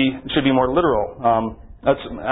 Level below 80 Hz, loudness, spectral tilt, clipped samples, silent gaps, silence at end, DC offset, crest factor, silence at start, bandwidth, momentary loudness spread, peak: -40 dBFS; -19 LUFS; -11 dB/octave; under 0.1%; none; 0 s; under 0.1%; 16 dB; 0 s; 4 kHz; 6 LU; -2 dBFS